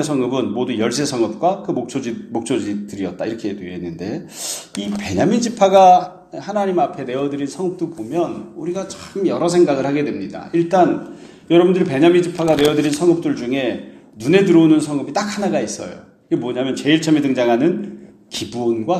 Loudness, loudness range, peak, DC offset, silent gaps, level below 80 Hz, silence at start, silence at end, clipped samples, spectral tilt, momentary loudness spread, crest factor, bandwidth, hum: -18 LUFS; 7 LU; 0 dBFS; under 0.1%; none; -56 dBFS; 0 s; 0 s; under 0.1%; -5.5 dB/octave; 13 LU; 18 dB; 14 kHz; none